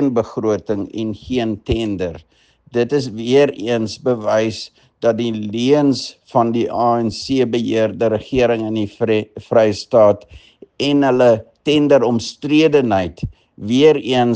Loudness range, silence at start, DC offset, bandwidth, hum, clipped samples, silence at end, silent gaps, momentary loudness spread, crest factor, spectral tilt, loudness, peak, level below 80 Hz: 4 LU; 0 s; under 0.1%; 9.2 kHz; none; under 0.1%; 0 s; none; 10 LU; 16 dB; -6 dB/octave; -17 LUFS; 0 dBFS; -46 dBFS